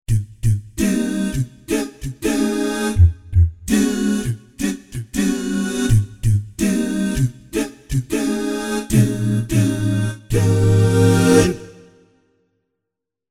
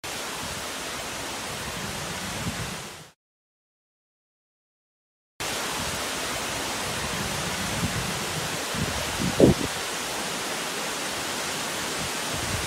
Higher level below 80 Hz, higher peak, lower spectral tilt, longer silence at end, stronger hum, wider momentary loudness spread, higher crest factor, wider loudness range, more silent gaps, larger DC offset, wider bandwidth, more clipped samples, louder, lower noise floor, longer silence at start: first, -32 dBFS vs -46 dBFS; about the same, 0 dBFS vs -2 dBFS; first, -6 dB/octave vs -3 dB/octave; first, 1.6 s vs 0 s; neither; first, 10 LU vs 5 LU; second, 18 dB vs 28 dB; second, 4 LU vs 10 LU; second, none vs 3.15-5.39 s; neither; about the same, 15.5 kHz vs 16 kHz; neither; first, -19 LUFS vs -28 LUFS; second, -82 dBFS vs under -90 dBFS; about the same, 0.1 s vs 0.05 s